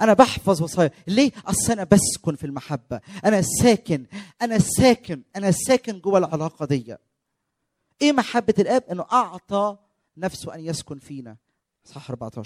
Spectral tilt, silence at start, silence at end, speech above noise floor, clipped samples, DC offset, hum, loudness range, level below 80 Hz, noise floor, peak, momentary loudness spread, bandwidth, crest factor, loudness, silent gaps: -5 dB/octave; 0 s; 0 s; 57 dB; under 0.1%; under 0.1%; none; 5 LU; -50 dBFS; -78 dBFS; -2 dBFS; 16 LU; 16 kHz; 20 dB; -21 LUFS; none